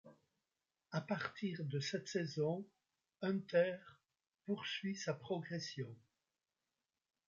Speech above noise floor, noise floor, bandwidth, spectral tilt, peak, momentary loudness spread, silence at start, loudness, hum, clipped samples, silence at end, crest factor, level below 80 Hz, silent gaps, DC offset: over 49 dB; under -90 dBFS; 7.6 kHz; -5 dB/octave; -22 dBFS; 11 LU; 0.05 s; -42 LUFS; none; under 0.1%; 1.3 s; 20 dB; -84 dBFS; none; under 0.1%